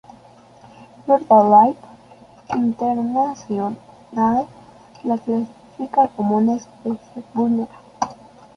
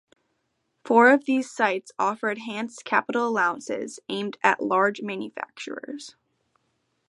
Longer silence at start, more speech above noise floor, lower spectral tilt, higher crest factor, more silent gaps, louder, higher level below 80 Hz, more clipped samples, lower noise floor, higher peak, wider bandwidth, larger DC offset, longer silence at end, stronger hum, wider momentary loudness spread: about the same, 0.8 s vs 0.85 s; second, 29 dB vs 50 dB; first, -7.5 dB/octave vs -4 dB/octave; second, 18 dB vs 24 dB; neither; first, -19 LUFS vs -24 LUFS; first, -60 dBFS vs -78 dBFS; neither; second, -47 dBFS vs -75 dBFS; about the same, -2 dBFS vs -2 dBFS; second, 6.8 kHz vs 11.5 kHz; neither; second, 0.4 s vs 1 s; neither; about the same, 18 LU vs 17 LU